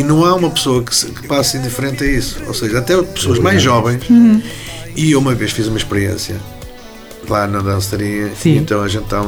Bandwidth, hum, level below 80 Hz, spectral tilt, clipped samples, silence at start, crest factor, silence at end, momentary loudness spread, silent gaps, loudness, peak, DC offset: over 20 kHz; none; -32 dBFS; -5 dB/octave; under 0.1%; 0 s; 14 dB; 0 s; 14 LU; none; -14 LUFS; 0 dBFS; under 0.1%